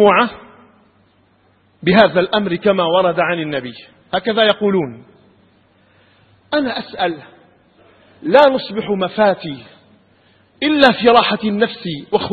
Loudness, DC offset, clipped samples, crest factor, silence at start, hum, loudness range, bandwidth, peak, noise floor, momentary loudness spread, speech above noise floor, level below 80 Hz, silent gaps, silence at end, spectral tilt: -15 LUFS; under 0.1%; under 0.1%; 16 dB; 0 s; none; 5 LU; 7.4 kHz; 0 dBFS; -55 dBFS; 13 LU; 41 dB; -52 dBFS; none; 0 s; -7 dB/octave